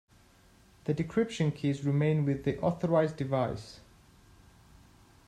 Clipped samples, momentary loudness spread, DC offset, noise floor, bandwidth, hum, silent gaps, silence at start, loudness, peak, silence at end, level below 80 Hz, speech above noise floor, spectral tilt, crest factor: under 0.1%; 7 LU; under 0.1%; -61 dBFS; 9.8 kHz; none; none; 0.85 s; -30 LUFS; -14 dBFS; 1.5 s; -60 dBFS; 31 dB; -7.5 dB/octave; 18 dB